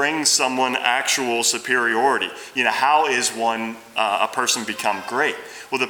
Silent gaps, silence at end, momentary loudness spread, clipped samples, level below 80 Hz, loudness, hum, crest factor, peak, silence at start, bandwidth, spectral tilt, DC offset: none; 0 s; 7 LU; under 0.1%; -72 dBFS; -20 LUFS; none; 18 dB; -2 dBFS; 0 s; over 20 kHz; -0.5 dB/octave; under 0.1%